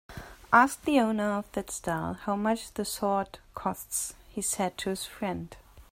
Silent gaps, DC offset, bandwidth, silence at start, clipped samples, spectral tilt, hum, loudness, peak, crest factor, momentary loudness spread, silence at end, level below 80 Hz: none; under 0.1%; 16 kHz; 0.1 s; under 0.1%; -4 dB/octave; none; -29 LUFS; -6 dBFS; 24 dB; 12 LU; 0.1 s; -56 dBFS